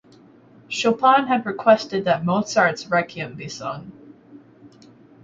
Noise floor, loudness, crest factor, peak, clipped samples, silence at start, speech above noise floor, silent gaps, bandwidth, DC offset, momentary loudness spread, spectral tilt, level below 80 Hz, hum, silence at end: -50 dBFS; -20 LUFS; 20 dB; -2 dBFS; under 0.1%; 0.7 s; 30 dB; none; 7.8 kHz; under 0.1%; 15 LU; -5 dB/octave; -64 dBFS; none; 0.55 s